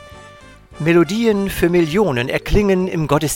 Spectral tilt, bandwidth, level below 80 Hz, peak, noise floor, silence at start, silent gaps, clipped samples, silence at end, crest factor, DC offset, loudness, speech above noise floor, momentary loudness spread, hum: -6 dB/octave; 17 kHz; -32 dBFS; 0 dBFS; -41 dBFS; 0 s; none; under 0.1%; 0 s; 16 dB; under 0.1%; -17 LUFS; 26 dB; 3 LU; none